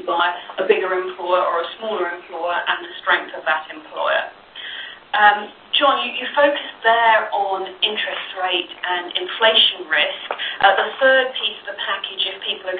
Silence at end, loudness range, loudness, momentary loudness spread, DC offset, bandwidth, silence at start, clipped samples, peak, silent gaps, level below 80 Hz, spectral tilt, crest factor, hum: 0 s; 5 LU; -19 LUFS; 10 LU; under 0.1%; 4.7 kHz; 0 s; under 0.1%; 0 dBFS; none; -66 dBFS; -6.5 dB/octave; 20 dB; none